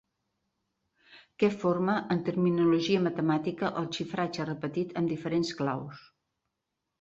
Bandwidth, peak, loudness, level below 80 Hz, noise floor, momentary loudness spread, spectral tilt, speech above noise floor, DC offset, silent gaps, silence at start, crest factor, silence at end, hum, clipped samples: 7.8 kHz; -12 dBFS; -29 LUFS; -68 dBFS; -84 dBFS; 8 LU; -6.5 dB/octave; 56 dB; under 0.1%; none; 1.1 s; 18 dB; 1 s; none; under 0.1%